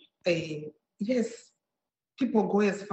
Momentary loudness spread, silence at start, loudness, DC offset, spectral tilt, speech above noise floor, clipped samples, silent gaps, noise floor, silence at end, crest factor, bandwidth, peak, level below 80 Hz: 14 LU; 0.25 s; -29 LUFS; under 0.1%; -6 dB/octave; 61 dB; under 0.1%; none; -89 dBFS; 0 s; 18 dB; 8.4 kHz; -12 dBFS; -72 dBFS